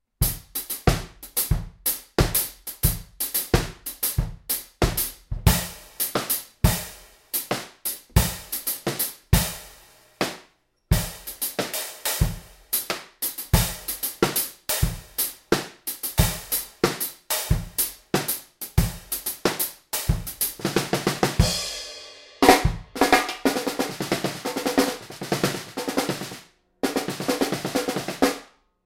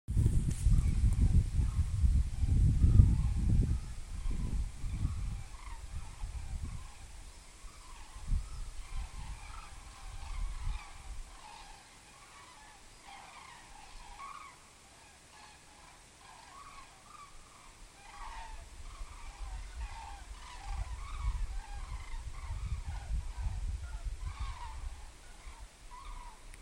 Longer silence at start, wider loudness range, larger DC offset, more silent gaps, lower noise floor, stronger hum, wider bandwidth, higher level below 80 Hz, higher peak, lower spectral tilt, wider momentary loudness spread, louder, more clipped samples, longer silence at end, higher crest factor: about the same, 0.2 s vs 0.1 s; second, 5 LU vs 21 LU; neither; neither; about the same, -60 dBFS vs -57 dBFS; neither; first, 17 kHz vs 12 kHz; about the same, -34 dBFS vs -36 dBFS; first, 0 dBFS vs -8 dBFS; second, -4 dB/octave vs -6 dB/octave; second, 8 LU vs 23 LU; first, -25 LUFS vs -36 LUFS; neither; first, 0.4 s vs 0 s; about the same, 26 dB vs 26 dB